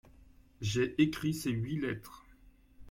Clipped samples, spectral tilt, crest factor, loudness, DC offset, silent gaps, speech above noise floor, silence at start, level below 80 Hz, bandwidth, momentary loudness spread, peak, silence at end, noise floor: under 0.1%; -6 dB/octave; 20 dB; -34 LUFS; under 0.1%; none; 28 dB; 0.2 s; -58 dBFS; 16.5 kHz; 11 LU; -14 dBFS; 0 s; -60 dBFS